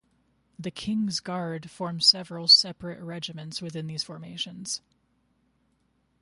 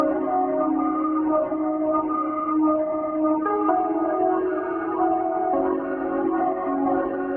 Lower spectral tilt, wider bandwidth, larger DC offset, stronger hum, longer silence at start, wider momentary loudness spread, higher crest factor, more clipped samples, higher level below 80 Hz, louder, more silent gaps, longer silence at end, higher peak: second, -3 dB/octave vs -11.5 dB/octave; first, 11.5 kHz vs 3.2 kHz; neither; neither; first, 0.6 s vs 0 s; first, 19 LU vs 3 LU; first, 24 dB vs 14 dB; neither; second, -66 dBFS vs -58 dBFS; about the same, -24 LUFS vs -23 LUFS; neither; first, 1.45 s vs 0 s; about the same, -6 dBFS vs -8 dBFS